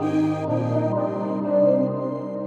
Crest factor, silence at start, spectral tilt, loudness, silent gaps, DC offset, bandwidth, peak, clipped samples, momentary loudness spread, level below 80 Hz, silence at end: 14 dB; 0 s; -9.5 dB/octave; -23 LUFS; none; under 0.1%; 8.2 kHz; -8 dBFS; under 0.1%; 7 LU; -72 dBFS; 0 s